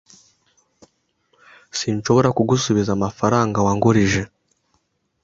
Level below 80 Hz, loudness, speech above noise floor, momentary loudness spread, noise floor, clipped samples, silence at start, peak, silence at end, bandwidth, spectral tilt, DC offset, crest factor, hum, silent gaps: -46 dBFS; -19 LUFS; 50 dB; 8 LU; -68 dBFS; under 0.1%; 1.75 s; -2 dBFS; 1 s; 7.8 kHz; -5.5 dB/octave; under 0.1%; 18 dB; none; none